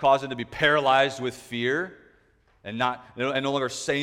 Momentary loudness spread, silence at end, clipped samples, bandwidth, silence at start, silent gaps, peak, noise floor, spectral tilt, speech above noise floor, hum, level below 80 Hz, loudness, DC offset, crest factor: 12 LU; 0 s; under 0.1%; 16 kHz; 0 s; none; -6 dBFS; -62 dBFS; -4 dB/octave; 37 dB; none; -60 dBFS; -25 LUFS; under 0.1%; 18 dB